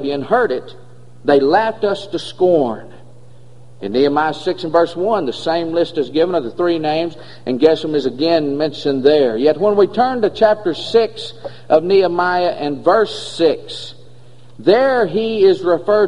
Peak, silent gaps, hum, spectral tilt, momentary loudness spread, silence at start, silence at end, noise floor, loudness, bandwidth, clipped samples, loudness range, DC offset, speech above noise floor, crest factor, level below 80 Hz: 0 dBFS; none; none; -6 dB/octave; 10 LU; 0 s; 0 s; -44 dBFS; -16 LUFS; 10.5 kHz; under 0.1%; 3 LU; 1%; 28 dB; 16 dB; -54 dBFS